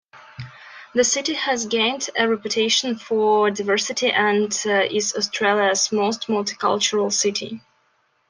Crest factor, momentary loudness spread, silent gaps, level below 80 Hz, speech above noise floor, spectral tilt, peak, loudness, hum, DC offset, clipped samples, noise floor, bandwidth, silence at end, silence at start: 18 dB; 9 LU; none; -68 dBFS; 44 dB; -2 dB/octave; -4 dBFS; -20 LUFS; none; under 0.1%; under 0.1%; -65 dBFS; 10.5 kHz; 0.7 s; 0.15 s